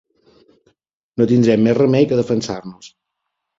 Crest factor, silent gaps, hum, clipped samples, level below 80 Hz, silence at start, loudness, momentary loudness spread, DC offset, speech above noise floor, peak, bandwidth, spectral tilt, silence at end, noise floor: 16 dB; none; none; under 0.1%; -54 dBFS; 1.15 s; -16 LUFS; 16 LU; under 0.1%; 62 dB; -2 dBFS; 7.8 kHz; -7 dB/octave; 0.7 s; -77 dBFS